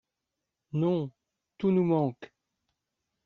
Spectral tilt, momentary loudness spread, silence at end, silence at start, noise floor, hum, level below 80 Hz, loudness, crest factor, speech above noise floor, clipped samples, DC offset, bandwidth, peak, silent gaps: -9 dB/octave; 13 LU; 1 s; 0.75 s; -86 dBFS; none; -72 dBFS; -29 LUFS; 18 dB; 59 dB; under 0.1%; under 0.1%; 4.4 kHz; -14 dBFS; none